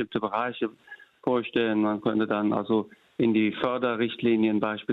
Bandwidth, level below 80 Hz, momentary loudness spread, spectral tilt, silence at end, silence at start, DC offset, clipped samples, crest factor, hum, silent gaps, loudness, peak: 4.5 kHz; -68 dBFS; 6 LU; -8.5 dB/octave; 0 s; 0 s; under 0.1%; under 0.1%; 16 dB; none; none; -26 LUFS; -10 dBFS